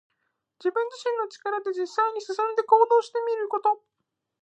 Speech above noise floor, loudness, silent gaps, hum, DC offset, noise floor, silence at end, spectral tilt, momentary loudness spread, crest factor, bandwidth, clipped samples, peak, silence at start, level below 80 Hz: 53 dB; -25 LUFS; none; none; under 0.1%; -77 dBFS; 0.65 s; -1.5 dB/octave; 10 LU; 20 dB; 8.6 kHz; under 0.1%; -6 dBFS; 0.6 s; under -90 dBFS